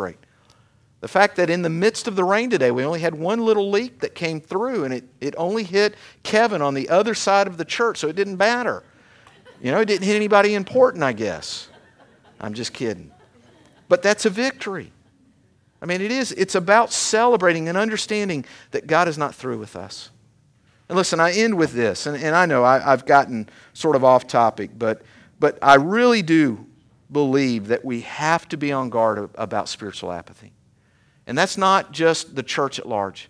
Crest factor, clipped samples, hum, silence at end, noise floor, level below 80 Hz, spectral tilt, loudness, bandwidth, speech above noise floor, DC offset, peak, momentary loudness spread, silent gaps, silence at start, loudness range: 20 dB; under 0.1%; none; 0.05 s; -59 dBFS; -64 dBFS; -4.5 dB/octave; -20 LUFS; 11 kHz; 39 dB; under 0.1%; 0 dBFS; 14 LU; none; 0 s; 6 LU